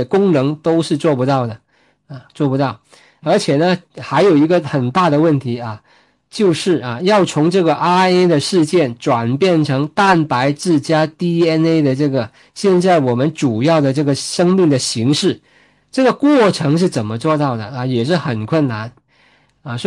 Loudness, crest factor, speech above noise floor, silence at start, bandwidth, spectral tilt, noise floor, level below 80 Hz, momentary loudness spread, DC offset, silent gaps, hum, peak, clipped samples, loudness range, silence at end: -15 LUFS; 14 dB; 39 dB; 0 s; 11.5 kHz; -6 dB/octave; -54 dBFS; -60 dBFS; 8 LU; under 0.1%; none; none; -2 dBFS; under 0.1%; 3 LU; 0 s